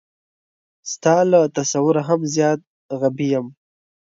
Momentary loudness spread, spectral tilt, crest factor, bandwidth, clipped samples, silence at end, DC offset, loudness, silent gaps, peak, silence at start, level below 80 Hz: 16 LU; -5.5 dB/octave; 18 dB; 7.8 kHz; under 0.1%; 0.6 s; under 0.1%; -19 LUFS; 2.67-2.89 s; -2 dBFS; 0.85 s; -68 dBFS